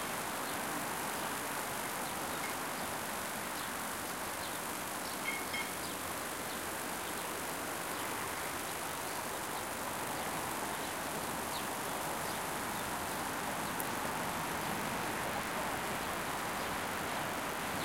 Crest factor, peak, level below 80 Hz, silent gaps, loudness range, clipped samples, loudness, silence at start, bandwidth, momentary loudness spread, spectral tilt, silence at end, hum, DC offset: 20 dB; -18 dBFS; -62 dBFS; none; 1 LU; under 0.1%; -37 LUFS; 0 s; 17 kHz; 2 LU; -2.5 dB/octave; 0 s; none; under 0.1%